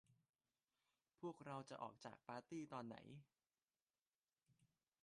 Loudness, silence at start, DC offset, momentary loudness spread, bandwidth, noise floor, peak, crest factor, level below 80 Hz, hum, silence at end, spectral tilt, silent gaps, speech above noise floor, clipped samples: -55 LUFS; 0.1 s; under 0.1%; 8 LU; 10.5 kHz; under -90 dBFS; -38 dBFS; 20 dB; under -90 dBFS; none; 0.35 s; -6 dB/octave; 0.29-0.33 s, 3.82-3.86 s, 4.02-4.06 s, 4.15-4.19 s; over 35 dB; under 0.1%